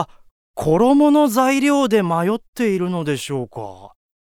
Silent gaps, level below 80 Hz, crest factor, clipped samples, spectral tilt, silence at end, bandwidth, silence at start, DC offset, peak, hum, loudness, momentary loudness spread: 0.31-0.54 s, 2.48-2.53 s; -52 dBFS; 16 dB; under 0.1%; -6 dB/octave; 0.4 s; 16.5 kHz; 0 s; under 0.1%; -2 dBFS; none; -17 LUFS; 17 LU